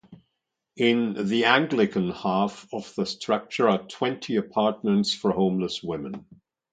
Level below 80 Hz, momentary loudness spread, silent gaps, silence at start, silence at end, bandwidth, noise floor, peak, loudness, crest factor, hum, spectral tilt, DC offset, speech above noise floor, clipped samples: -62 dBFS; 11 LU; none; 0.1 s; 0.5 s; 9.2 kHz; -81 dBFS; -2 dBFS; -25 LUFS; 24 dB; none; -5.5 dB/octave; under 0.1%; 56 dB; under 0.1%